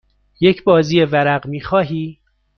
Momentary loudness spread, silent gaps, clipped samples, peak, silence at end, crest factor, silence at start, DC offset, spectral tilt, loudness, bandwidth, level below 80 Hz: 10 LU; none; under 0.1%; -2 dBFS; 0.45 s; 16 dB; 0.4 s; under 0.1%; -7 dB/octave; -16 LUFS; 6.8 kHz; -48 dBFS